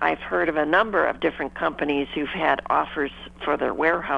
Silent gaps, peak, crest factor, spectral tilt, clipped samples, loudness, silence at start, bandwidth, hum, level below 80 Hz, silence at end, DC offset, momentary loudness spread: none; -4 dBFS; 20 dB; -6.5 dB/octave; under 0.1%; -23 LUFS; 0 s; 9 kHz; none; -50 dBFS; 0 s; under 0.1%; 7 LU